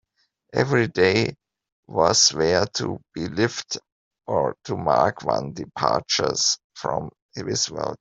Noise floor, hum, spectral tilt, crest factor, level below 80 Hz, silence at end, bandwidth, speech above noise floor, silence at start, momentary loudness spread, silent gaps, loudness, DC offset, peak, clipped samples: -64 dBFS; none; -3 dB/octave; 22 dB; -56 dBFS; 0.05 s; 8.2 kHz; 42 dB; 0.55 s; 12 LU; 1.72-1.83 s, 3.92-4.11 s, 6.64-6.70 s, 7.22-7.29 s; -22 LUFS; under 0.1%; -2 dBFS; under 0.1%